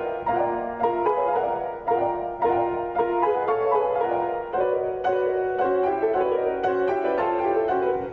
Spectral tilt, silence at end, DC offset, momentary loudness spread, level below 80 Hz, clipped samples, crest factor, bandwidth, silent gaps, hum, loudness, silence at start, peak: -4.5 dB/octave; 0 s; under 0.1%; 3 LU; -54 dBFS; under 0.1%; 12 dB; 5.2 kHz; none; none; -24 LUFS; 0 s; -12 dBFS